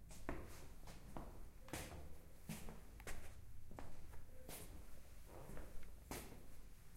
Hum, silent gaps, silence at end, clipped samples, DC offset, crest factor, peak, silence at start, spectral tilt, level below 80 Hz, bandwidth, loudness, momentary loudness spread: none; none; 0 s; under 0.1%; under 0.1%; 24 dB; -26 dBFS; 0 s; -4.5 dB/octave; -56 dBFS; 16 kHz; -57 LUFS; 9 LU